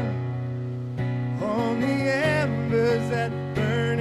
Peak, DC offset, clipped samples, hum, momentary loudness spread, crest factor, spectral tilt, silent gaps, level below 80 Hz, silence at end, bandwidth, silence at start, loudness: -12 dBFS; under 0.1%; under 0.1%; none; 8 LU; 12 dB; -7 dB/octave; none; -54 dBFS; 0 s; 12 kHz; 0 s; -25 LUFS